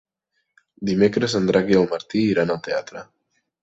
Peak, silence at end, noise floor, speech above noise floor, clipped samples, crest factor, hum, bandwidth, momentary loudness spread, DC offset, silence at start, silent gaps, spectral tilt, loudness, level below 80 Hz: -4 dBFS; 0.6 s; -75 dBFS; 55 dB; under 0.1%; 18 dB; none; 8 kHz; 11 LU; under 0.1%; 0.8 s; none; -6 dB/octave; -21 LUFS; -56 dBFS